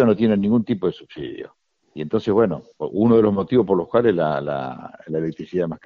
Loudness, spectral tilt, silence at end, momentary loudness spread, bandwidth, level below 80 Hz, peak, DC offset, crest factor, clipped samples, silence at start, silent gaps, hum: -20 LUFS; -7 dB/octave; 0.1 s; 16 LU; 6.4 kHz; -54 dBFS; -4 dBFS; under 0.1%; 16 dB; under 0.1%; 0 s; none; none